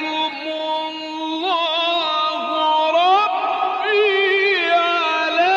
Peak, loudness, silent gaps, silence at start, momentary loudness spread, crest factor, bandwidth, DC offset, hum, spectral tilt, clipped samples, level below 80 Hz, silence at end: -6 dBFS; -18 LUFS; none; 0 s; 8 LU; 12 dB; 7.8 kHz; under 0.1%; none; -2 dB/octave; under 0.1%; -74 dBFS; 0 s